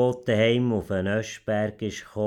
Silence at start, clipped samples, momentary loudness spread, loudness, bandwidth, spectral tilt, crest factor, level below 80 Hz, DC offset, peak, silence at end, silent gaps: 0 s; under 0.1%; 8 LU; -25 LUFS; 13.5 kHz; -6 dB/octave; 14 dB; -56 dBFS; under 0.1%; -10 dBFS; 0 s; none